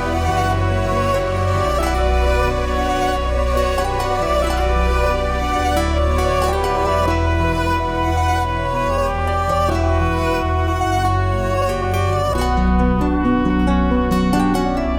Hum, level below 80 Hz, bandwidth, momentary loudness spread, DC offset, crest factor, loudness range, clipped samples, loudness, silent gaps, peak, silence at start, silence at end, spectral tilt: none; -24 dBFS; 18 kHz; 2 LU; under 0.1%; 12 dB; 1 LU; under 0.1%; -18 LUFS; none; -4 dBFS; 0 s; 0 s; -6 dB/octave